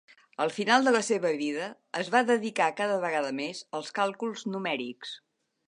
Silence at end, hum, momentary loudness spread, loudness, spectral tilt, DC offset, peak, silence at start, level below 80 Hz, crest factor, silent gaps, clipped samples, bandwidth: 0.5 s; none; 13 LU; -28 LUFS; -3.5 dB/octave; under 0.1%; -8 dBFS; 0.4 s; -82 dBFS; 20 dB; none; under 0.1%; 11 kHz